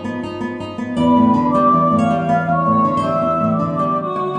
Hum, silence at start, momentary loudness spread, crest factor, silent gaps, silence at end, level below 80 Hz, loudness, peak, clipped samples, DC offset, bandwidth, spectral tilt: none; 0 s; 11 LU; 14 dB; none; 0 s; -48 dBFS; -16 LUFS; -2 dBFS; under 0.1%; under 0.1%; 9.6 kHz; -8.5 dB/octave